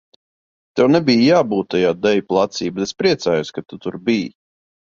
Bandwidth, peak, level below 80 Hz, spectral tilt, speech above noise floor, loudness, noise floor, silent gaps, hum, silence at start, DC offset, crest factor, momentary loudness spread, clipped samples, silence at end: 7.4 kHz; -2 dBFS; -56 dBFS; -5.5 dB/octave; over 73 dB; -17 LUFS; under -90 dBFS; none; none; 0.75 s; under 0.1%; 16 dB; 14 LU; under 0.1%; 0.65 s